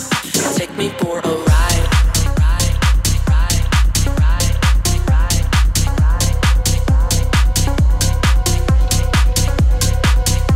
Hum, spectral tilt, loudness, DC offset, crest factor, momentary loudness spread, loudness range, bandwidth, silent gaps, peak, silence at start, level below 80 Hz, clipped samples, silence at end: none; -4 dB/octave; -15 LUFS; under 0.1%; 10 dB; 2 LU; 0 LU; 16.5 kHz; none; -2 dBFS; 0 s; -16 dBFS; under 0.1%; 0 s